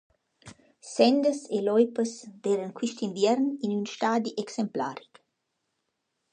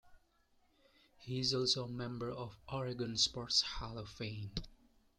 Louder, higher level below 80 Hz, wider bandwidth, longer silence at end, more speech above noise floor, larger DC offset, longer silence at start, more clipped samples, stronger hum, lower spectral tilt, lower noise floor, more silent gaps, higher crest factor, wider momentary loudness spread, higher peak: first, -27 LUFS vs -37 LUFS; second, -76 dBFS vs -60 dBFS; second, 9.6 kHz vs 12.5 kHz; first, 1.35 s vs 0.45 s; first, 53 dB vs 34 dB; neither; first, 0.45 s vs 0.05 s; neither; neither; first, -5 dB/octave vs -3.5 dB/octave; first, -80 dBFS vs -73 dBFS; neither; about the same, 22 dB vs 22 dB; second, 10 LU vs 13 LU; first, -6 dBFS vs -18 dBFS